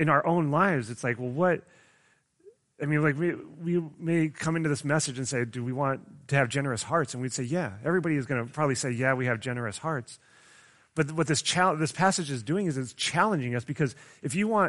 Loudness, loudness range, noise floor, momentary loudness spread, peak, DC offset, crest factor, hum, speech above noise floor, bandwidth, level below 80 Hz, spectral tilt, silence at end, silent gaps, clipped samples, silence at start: -28 LUFS; 3 LU; -66 dBFS; 8 LU; -8 dBFS; under 0.1%; 20 dB; none; 39 dB; 11.5 kHz; -66 dBFS; -5 dB/octave; 0 s; none; under 0.1%; 0 s